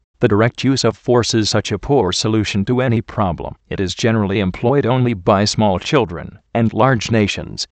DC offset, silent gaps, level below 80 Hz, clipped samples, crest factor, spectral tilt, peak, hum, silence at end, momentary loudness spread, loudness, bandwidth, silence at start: under 0.1%; none; -42 dBFS; under 0.1%; 16 dB; -5.5 dB/octave; 0 dBFS; none; 0.15 s; 7 LU; -17 LUFS; 9 kHz; 0.2 s